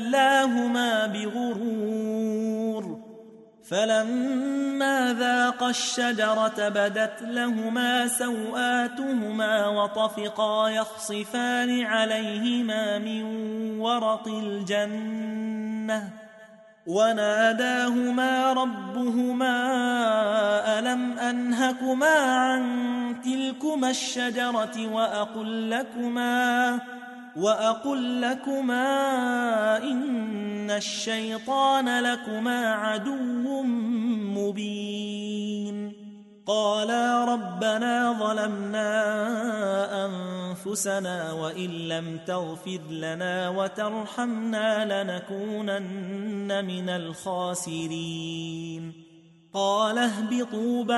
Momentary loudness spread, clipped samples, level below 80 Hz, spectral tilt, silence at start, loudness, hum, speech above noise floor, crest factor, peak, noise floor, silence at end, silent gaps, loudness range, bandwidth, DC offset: 9 LU; under 0.1%; -76 dBFS; -4 dB/octave; 0 s; -26 LUFS; none; 25 dB; 16 dB; -10 dBFS; -51 dBFS; 0 s; none; 6 LU; 12 kHz; under 0.1%